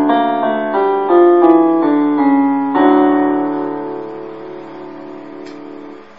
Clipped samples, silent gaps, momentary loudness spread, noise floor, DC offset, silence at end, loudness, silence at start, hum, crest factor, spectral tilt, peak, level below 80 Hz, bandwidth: under 0.1%; none; 21 LU; -33 dBFS; 0.6%; 0.15 s; -13 LUFS; 0 s; none; 14 dB; -8.5 dB/octave; 0 dBFS; -70 dBFS; 5.2 kHz